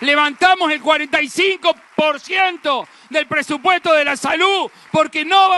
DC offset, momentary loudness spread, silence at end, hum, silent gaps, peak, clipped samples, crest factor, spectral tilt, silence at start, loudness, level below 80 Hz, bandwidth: under 0.1%; 7 LU; 0 s; none; none; -2 dBFS; under 0.1%; 14 dB; -2.5 dB/octave; 0 s; -16 LUFS; -62 dBFS; 12 kHz